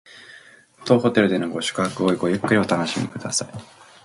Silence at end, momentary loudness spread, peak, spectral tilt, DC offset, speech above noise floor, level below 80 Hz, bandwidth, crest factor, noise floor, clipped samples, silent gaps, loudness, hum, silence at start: 0.4 s; 16 LU; -2 dBFS; -4.5 dB/octave; under 0.1%; 27 dB; -60 dBFS; 11.5 kHz; 20 dB; -48 dBFS; under 0.1%; none; -21 LUFS; none; 0.15 s